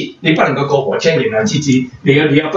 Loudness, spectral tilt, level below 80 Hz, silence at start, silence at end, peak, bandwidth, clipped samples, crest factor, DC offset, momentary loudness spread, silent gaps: -13 LUFS; -5.5 dB/octave; -52 dBFS; 0 s; 0 s; 0 dBFS; 7.8 kHz; under 0.1%; 14 dB; under 0.1%; 4 LU; none